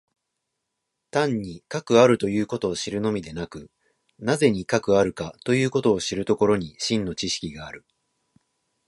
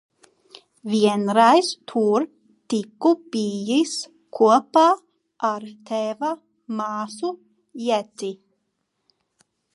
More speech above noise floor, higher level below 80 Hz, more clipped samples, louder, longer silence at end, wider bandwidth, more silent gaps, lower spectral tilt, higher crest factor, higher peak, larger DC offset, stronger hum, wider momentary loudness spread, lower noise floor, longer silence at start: about the same, 57 dB vs 54 dB; first, -54 dBFS vs -78 dBFS; neither; about the same, -23 LUFS vs -22 LUFS; second, 1.1 s vs 1.4 s; about the same, 11.5 kHz vs 11.5 kHz; neither; about the same, -5 dB/octave vs -4.5 dB/octave; about the same, 22 dB vs 20 dB; about the same, -4 dBFS vs -2 dBFS; neither; neither; about the same, 15 LU vs 16 LU; first, -80 dBFS vs -75 dBFS; first, 1.15 s vs 0.85 s